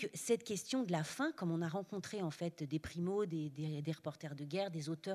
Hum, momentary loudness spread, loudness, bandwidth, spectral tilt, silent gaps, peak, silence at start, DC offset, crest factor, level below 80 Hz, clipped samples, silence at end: none; 6 LU; -40 LUFS; 13.5 kHz; -5.5 dB/octave; none; -22 dBFS; 0 s; under 0.1%; 18 dB; -72 dBFS; under 0.1%; 0 s